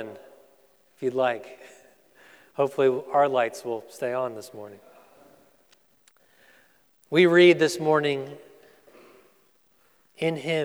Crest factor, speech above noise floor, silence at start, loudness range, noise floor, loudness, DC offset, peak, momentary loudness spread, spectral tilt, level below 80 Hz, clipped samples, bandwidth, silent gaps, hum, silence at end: 22 dB; 41 dB; 0 s; 11 LU; -64 dBFS; -23 LUFS; under 0.1%; -6 dBFS; 23 LU; -5.5 dB/octave; -82 dBFS; under 0.1%; 14 kHz; none; none; 0 s